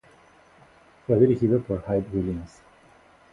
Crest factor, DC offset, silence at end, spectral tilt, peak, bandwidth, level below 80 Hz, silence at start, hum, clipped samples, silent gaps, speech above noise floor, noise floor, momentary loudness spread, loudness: 20 dB; under 0.1%; 0.85 s; -10 dB/octave; -6 dBFS; 7.6 kHz; -48 dBFS; 1.1 s; none; under 0.1%; none; 32 dB; -55 dBFS; 17 LU; -24 LUFS